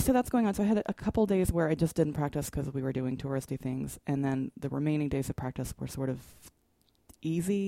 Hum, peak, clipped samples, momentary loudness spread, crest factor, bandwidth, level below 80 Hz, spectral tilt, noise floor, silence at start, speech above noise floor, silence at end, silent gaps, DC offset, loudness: none; -14 dBFS; under 0.1%; 9 LU; 18 dB; 16.5 kHz; -48 dBFS; -7 dB/octave; -70 dBFS; 0 s; 40 dB; 0 s; none; under 0.1%; -31 LUFS